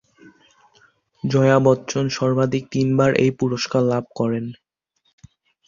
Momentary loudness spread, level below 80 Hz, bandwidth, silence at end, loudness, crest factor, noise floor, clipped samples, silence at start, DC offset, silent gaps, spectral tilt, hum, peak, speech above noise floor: 8 LU; -56 dBFS; 7.4 kHz; 1.15 s; -20 LUFS; 20 dB; -69 dBFS; under 0.1%; 1.25 s; under 0.1%; none; -6.5 dB/octave; none; -2 dBFS; 50 dB